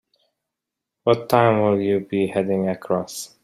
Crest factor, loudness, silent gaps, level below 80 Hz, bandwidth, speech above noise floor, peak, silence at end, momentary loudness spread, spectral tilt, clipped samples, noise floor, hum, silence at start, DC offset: 20 dB; -21 LUFS; none; -62 dBFS; 15.5 kHz; 64 dB; -2 dBFS; 0.15 s; 8 LU; -6 dB/octave; under 0.1%; -84 dBFS; none; 1.05 s; under 0.1%